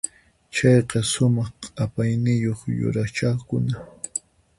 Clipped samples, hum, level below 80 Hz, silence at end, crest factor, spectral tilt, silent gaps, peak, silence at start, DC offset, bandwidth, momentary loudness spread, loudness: under 0.1%; none; -50 dBFS; 0.4 s; 18 dB; -5.5 dB/octave; none; -4 dBFS; 0.05 s; under 0.1%; 11.5 kHz; 13 LU; -23 LUFS